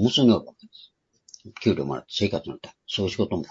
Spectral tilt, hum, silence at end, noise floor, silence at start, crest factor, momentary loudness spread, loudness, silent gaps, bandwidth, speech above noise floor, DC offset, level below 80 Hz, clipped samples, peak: -6 dB/octave; none; 0.05 s; -58 dBFS; 0 s; 20 dB; 20 LU; -25 LUFS; none; 7.8 kHz; 34 dB; under 0.1%; -58 dBFS; under 0.1%; -6 dBFS